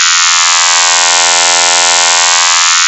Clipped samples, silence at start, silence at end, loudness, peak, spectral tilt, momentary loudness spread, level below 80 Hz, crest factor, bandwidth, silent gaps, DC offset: under 0.1%; 0 s; 0 s; -5 LUFS; 0 dBFS; 4 dB/octave; 0 LU; -58 dBFS; 8 dB; 9 kHz; none; under 0.1%